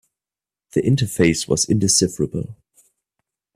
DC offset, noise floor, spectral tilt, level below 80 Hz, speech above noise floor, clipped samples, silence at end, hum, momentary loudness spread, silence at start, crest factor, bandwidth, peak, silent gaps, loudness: under 0.1%; under -90 dBFS; -4.5 dB/octave; -48 dBFS; over 71 dB; under 0.1%; 1 s; none; 10 LU; 0.75 s; 18 dB; 15.5 kHz; -2 dBFS; none; -19 LUFS